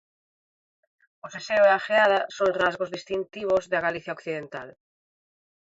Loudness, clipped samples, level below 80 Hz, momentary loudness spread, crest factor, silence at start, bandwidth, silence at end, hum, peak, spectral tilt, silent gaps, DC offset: -24 LUFS; under 0.1%; -66 dBFS; 16 LU; 18 dB; 1.25 s; 7.8 kHz; 1.05 s; none; -8 dBFS; -4 dB/octave; none; under 0.1%